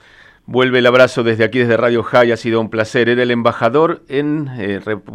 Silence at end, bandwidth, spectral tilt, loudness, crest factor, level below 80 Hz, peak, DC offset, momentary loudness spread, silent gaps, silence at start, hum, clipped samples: 0 s; 11 kHz; -6 dB/octave; -14 LUFS; 14 dB; -56 dBFS; 0 dBFS; under 0.1%; 10 LU; none; 0.5 s; none; under 0.1%